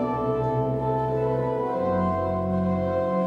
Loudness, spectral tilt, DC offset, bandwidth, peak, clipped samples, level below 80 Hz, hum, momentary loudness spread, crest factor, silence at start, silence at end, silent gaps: -25 LUFS; -10 dB/octave; under 0.1%; 6.2 kHz; -14 dBFS; under 0.1%; -48 dBFS; none; 1 LU; 12 dB; 0 s; 0 s; none